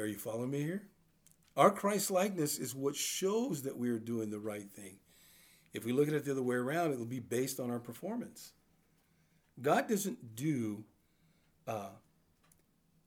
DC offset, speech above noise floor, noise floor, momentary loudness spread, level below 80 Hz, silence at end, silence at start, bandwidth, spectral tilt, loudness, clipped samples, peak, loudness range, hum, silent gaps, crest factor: under 0.1%; 37 dB; -72 dBFS; 15 LU; -80 dBFS; 1.1 s; 0 s; over 20 kHz; -4.5 dB/octave; -36 LUFS; under 0.1%; -12 dBFS; 5 LU; none; none; 26 dB